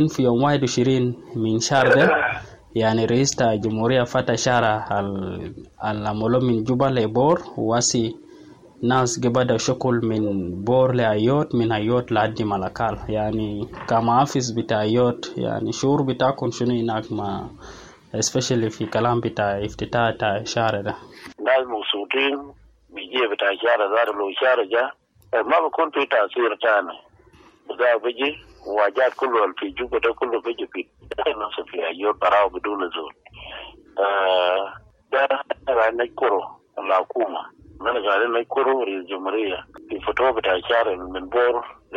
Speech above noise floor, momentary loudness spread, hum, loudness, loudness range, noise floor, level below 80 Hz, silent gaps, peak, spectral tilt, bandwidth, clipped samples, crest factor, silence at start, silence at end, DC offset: 31 dB; 11 LU; none; -21 LUFS; 4 LU; -52 dBFS; -52 dBFS; none; -6 dBFS; -5 dB/octave; 11.5 kHz; under 0.1%; 16 dB; 0 s; 0 s; under 0.1%